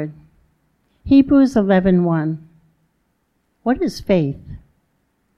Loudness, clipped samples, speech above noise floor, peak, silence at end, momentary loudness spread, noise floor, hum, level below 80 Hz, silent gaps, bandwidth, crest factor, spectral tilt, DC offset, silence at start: -17 LUFS; under 0.1%; 51 dB; -2 dBFS; 0.8 s; 18 LU; -67 dBFS; none; -42 dBFS; none; 11 kHz; 16 dB; -8 dB/octave; under 0.1%; 0 s